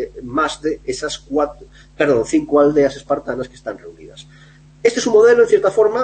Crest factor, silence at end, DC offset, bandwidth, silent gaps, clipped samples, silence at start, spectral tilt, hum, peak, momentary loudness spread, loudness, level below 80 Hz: 16 dB; 0 s; under 0.1%; 8.8 kHz; none; under 0.1%; 0 s; -4.5 dB/octave; none; -2 dBFS; 14 LU; -16 LUFS; -46 dBFS